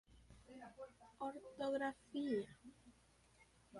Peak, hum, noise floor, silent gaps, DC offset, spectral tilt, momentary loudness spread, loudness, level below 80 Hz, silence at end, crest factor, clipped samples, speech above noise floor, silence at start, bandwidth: -30 dBFS; none; -72 dBFS; none; under 0.1%; -5.5 dB/octave; 21 LU; -46 LUFS; -74 dBFS; 0 s; 18 dB; under 0.1%; 27 dB; 0.1 s; 11.5 kHz